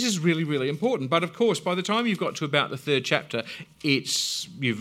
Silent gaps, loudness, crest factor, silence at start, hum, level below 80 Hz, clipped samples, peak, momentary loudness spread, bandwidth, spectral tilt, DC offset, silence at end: none; -25 LUFS; 20 dB; 0 s; none; -72 dBFS; under 0.1%; -4 dBFS; 5 LU; 16.5 kHz; -4 dB/octave; under 0.1%; 0 s